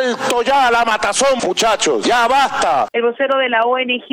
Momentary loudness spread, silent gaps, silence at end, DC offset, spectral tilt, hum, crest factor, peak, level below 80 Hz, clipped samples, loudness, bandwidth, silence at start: 4 LU; none; 0.05 s; under 0.1%; -1.5 dB/octave; none; 12 dB; -2 dBFS; -50 dBFS; under 0.1%; -15 LUFS; 17 kHz; 0 s